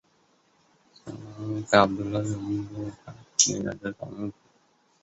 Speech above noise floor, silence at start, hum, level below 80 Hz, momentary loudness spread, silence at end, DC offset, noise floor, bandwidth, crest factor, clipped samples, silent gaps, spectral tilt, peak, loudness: 39 dB; 1.05 s; none; -58 dBFS; 21 LU; 0.7 s; under 0.1%; -65 dBFS; 8.6 kHz; 26 dB; under 0.1%; none; -3.5 dB/octave; -2 dBFS; -26 LUFS